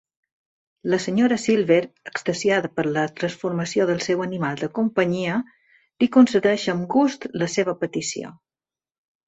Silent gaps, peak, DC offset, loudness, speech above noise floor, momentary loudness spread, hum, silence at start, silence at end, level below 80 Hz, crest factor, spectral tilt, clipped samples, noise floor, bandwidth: none; -4 dBFS; under 0.1%; -22 LUFS; over 69 dB; 10 LU; none; 0.85 s; 0.95 s; -64 dBFS; 20 dB; -5.5 dB/octave; under 0.1%; under -90 dBFS; 8.2 kHz